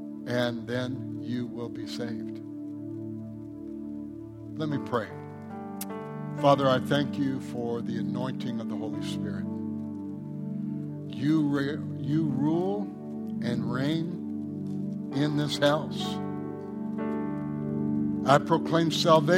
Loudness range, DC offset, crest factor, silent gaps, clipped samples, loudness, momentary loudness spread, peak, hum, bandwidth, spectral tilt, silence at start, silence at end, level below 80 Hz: 8 LU; under 0.1%; 22 dB; none; under 0.1%; -30 LUFS; 14 LU; -6 dBFS; none; 16 kHz; -6.5 dB/octave; 0 s; 0 s; -66 dBFS